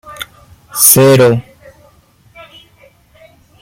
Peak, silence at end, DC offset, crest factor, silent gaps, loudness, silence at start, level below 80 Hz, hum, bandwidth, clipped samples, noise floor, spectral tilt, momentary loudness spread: 0 dBFS; 2.2 s; under 0.1%; 14 dB; none; -7 LUFS; 0.1 s; -50 dBFS; none; 17 kHz; 0.3%; -48 dBFS; -4 dB/octave; 23 LU